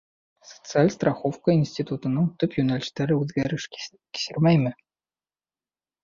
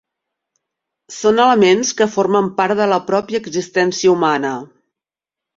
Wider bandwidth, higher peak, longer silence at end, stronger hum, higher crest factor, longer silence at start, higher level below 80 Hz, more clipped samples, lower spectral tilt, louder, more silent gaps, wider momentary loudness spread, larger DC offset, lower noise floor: about the same, 7.4 kHz vs 7.8 kHz; second, -6 dBFS vs 0 dBFS; first, 1.3 s vs 0.9 s; neither; about the same, 20 dB vs 16 dB; second, 0.5 s vs 1.1 s; about the same, -60 dBFS vs -60 dBFS; neither; first, -6.5 dB/octave vs -4 dB/octave; second, -24 LUFS vs -15 LUFS; neither; about the same, 11 LU vs 9 LU; neither; about the same, under -90 dBFS vs -87 dBFS